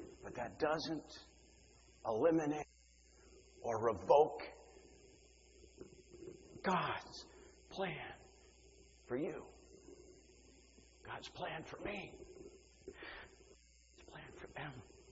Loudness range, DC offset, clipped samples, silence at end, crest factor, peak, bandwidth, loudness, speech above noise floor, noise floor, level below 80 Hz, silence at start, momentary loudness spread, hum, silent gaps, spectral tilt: 13 LU; under 0.1%; under 0.1%; 0 s; 26 dB; -16 dBFS; 7.6 kHz; -40 LUFS; 28 dB; -67 dBFS; -68 dBFS; 0 s; 26 LU; none; none; -4 dB/octave